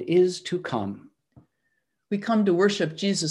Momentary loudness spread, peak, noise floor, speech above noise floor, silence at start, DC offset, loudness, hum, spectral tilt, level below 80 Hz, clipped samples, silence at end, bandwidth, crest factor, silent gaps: 11 LU; -10 dBFS; -76 dBFS; 52 dB; 0 s; under 0.1%; -25 LUFS; none; -5 dB/octave; -72 dBFS; under 0.1%; 0 s; 11.5 kHz; 16 dB; none